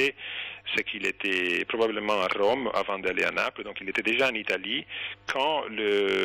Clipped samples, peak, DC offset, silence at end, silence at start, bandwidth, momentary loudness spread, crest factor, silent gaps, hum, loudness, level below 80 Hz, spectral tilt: under 0.1%; -16 dBFS; under 0.1%; 0 s; 0 s; 17.5 kHz; 7 LU; 12 dB; none; none; -27 LUFS; -64 dBFS; -3.5 dB/octave